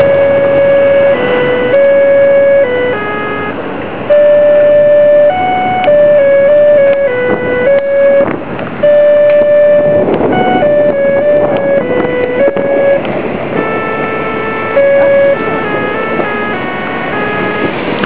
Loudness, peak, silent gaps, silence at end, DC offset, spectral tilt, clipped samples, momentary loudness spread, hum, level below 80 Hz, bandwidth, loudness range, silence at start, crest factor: -9 LUFS; 0 dBFS; none; 0 s; 4%; -9.5 dB/octave; under 0.1%; 9 LU; none; -42 dBFS; 4 kHz; 4 LU; 0 s; 8 dB